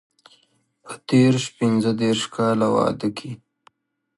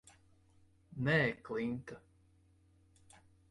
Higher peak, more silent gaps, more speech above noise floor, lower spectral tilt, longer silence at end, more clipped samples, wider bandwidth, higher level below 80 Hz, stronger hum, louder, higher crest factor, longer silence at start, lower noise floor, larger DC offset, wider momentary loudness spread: first, -6 dBFS vs -20 dBFS; neither; first, 44 dB vs 33 dB; about the same, -6 dB/octave vs -7 dB/octave; second, 0.8 s vs 1.5 s; neither; about the same, 11.5 kHz vs 11.5 kHz; first, -60 dBFS vs -68 dBFS; neither; first, -20 LUFS vs -35 LUFS; about the same, 18 dB vs 20 dB; about the same, 0.85 s vs 0.9 s; second, -64 dBFS vs -68 dBFS; neither; about the same, 20 LU vs 22 LU